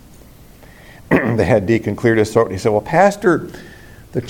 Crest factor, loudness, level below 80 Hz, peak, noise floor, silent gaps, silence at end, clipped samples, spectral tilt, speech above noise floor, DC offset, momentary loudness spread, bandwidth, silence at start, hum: 16 dB; -16 LUFS; -44 dBFS; 0 dBFS; -42 dBFS; none; 0 s; under 0.1%; -7 dB/octave; 27 dB; under 0.1%; 9 LU; 17 kHz; 1.1 s; none